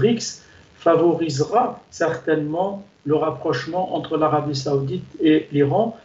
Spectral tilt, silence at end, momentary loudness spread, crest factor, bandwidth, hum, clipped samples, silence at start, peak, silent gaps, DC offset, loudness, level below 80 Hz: -6 dB/octave; 0.1 s; 8 LU; 16 dB; 8 kHz; none; under 0.1%; 0 s; -6 dBFS; none; under 0.1%; -21 LUFS; -58 dBFS